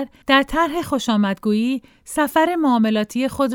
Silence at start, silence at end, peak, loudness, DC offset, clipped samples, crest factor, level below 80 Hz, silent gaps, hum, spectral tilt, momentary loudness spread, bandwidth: 0 s; 0 s; 0 dBFS; -19 LUFS; under 0.1%; under 0.1%; 18 dB; -46 dBFS; none; none; -5 dB/octave; 6 LU; 18.5 kHz